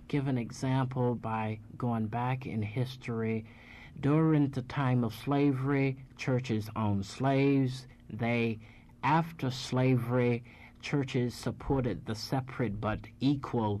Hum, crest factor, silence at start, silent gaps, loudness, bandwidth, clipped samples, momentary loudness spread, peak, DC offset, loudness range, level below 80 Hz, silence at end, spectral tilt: none; 14 dB; 0 s; none; -32 LUFS; 13 kHz; under 0.1%; 8 LU; -16 dBFS; under 0.1%; 3 LU; -56 dBFS; 0 s; -7.5 dB/octave